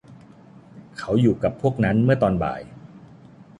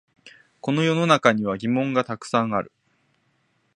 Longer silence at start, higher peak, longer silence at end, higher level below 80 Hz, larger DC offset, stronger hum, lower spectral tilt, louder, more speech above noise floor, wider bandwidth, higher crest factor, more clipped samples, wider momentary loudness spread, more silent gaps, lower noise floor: second, 0.1 s vs 0.25 s; second, -6 dBFS vs 0 dBFS; second, 0.15 s vs 1.1 s; first, -46 dBFS vs -64 dBFS; neither; neither; first, -8.5 dB/octave vs -6 dB/octave; about the same, -21 LUFS vs -22 LUFS; second, 27 dB vs 46 dB; about the same, 10.5 kHz vs 11 kHz; second, 18 dB vs 24 dB; neither; first, 17 LU vs 10 LU; neither; second, -47 dBFS vs -68 dBFS